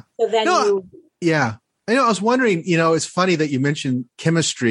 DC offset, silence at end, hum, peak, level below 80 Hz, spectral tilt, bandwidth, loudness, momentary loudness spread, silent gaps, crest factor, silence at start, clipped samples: under 0.1%; 0 s; none; -4 dBFS; -66 dBFS; -5 dB/octave; 11.5 kHz; -19 LUFS; 7 LU; none; 16 dB; 0.2 s; under 0.1%